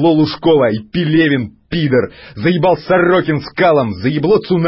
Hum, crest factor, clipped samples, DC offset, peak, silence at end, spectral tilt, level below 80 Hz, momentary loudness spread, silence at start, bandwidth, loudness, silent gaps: none; 10 dB; under 0.1%; under 0.1%; -2 dBFS; 0 s; -11.5 dB/octave; -44 dBFS; 7 LU; 0 s; 5.8 kHz; -14 LUFS; none